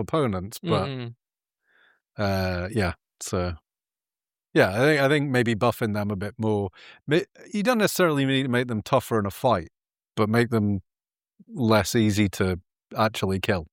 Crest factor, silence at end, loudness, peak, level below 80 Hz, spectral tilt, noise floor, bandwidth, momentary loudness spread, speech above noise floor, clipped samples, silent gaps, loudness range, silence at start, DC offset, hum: 20 dB; 0.05 s; -24 LUFS; -4 dBFS; -52 dBFS; -5.5 dB/octave; under -90 dBFS; 17 kHz; 12 LU; over 66 dB; under 0.1%; none; 5 LU; 0 s; under 0.1%; none